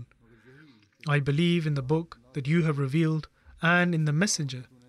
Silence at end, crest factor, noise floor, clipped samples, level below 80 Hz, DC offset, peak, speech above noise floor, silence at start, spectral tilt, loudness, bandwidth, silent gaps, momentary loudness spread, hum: 0.25 s; 16 dB; -57 dBFS; under 0.1%; -60 dBFS; under 0.1%; -12 dBFS; 31 dB; 0 s; -5.5 dB/octave; -26 LUFS; 12.5 kHz; none; 11 LU; none